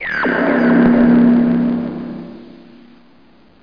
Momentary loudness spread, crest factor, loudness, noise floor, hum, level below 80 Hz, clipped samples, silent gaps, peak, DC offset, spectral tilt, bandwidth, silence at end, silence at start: 18 LU; 14 dB; -13 LUFS; -49 dBFS; none; -44 dBFS; under 0.1%; none; 0 dBFS; 0.3%; -9.5 dB/octave; 5.2 kHz; 1.25 s; 0 s